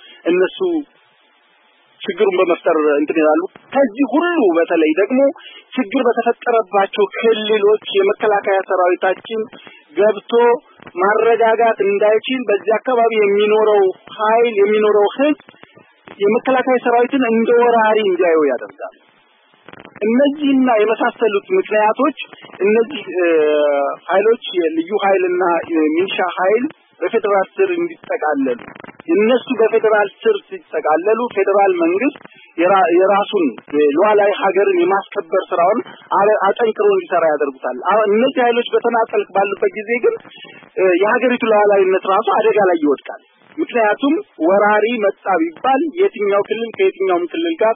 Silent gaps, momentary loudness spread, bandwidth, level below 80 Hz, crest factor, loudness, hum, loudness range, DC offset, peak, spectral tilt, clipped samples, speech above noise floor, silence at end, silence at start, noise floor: none; 8 LU; 3.7 kHz; -72 dBFS; 14 dB; -15 LUFS; none; 2 LU; under 0.1%; -2 dBFS; -10 dB/octave; under 0.1%; 39 dB; 0 s; 0.25 s; -54 dBFS